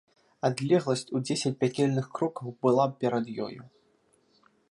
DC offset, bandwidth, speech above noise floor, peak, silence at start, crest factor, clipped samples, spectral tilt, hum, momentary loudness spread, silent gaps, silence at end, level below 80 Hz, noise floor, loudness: under 0.1%; 11.5 kHz; 40 dB; -10 dBFS; 0.45 s; 20 dB; under 0.1%; -6 dB/octave; none; 9 LU; none; 1.05 s; -74 dBFS; -67 dBFS; -28 LUFS